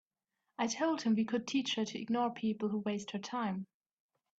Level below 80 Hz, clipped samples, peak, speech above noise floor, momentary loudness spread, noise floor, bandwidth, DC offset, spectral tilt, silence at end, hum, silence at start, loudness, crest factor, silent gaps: -80 dBFS; under 0.1%; -20 dBFS; 52 dB; 7 LU; -87 dBFS; 8 kHz; under 0.1%; -4.5 dB/octave; 0.75 s; none; 0.6 s; -35 LUFS; 16 dB; none